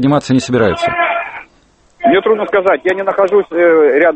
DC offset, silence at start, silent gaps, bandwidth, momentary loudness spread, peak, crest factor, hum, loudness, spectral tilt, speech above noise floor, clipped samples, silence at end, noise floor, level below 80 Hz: under 0.1%; 0 s; none; 8.8 kHz; 7 LU; -2 dBFS; 12 dB; none; -12 LUFS; -6 dB/octave; 39 dB; under 0.1%; 0 s; -51 dBFS; -48 dBFS